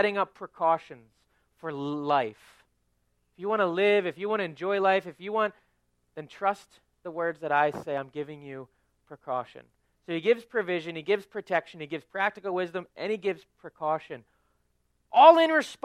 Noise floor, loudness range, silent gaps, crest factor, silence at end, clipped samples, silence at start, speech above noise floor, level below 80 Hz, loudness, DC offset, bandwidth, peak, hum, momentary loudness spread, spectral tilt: -73 dBFS; 5 LU; none; 24 dB; 0.1 s; under 0.1%; 0 s; 46 dB; -74 dBFS; -27 LUFS; under 0.1%; 12 kHz; -4 dBFS; 60 Hz at -70 dBFS; 16 LU; -5.5 dB/octave